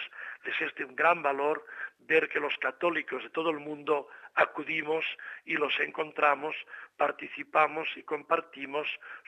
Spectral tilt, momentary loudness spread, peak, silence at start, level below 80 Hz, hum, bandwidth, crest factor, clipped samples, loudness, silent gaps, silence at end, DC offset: -5 dB/octave; 10 LU; -10 dBFS; 0 s; -82 dBFS; none; 9.8 kHz; 22 dB; under 0.1%; -30 LUFS; none; 0.1 s; under 0.1%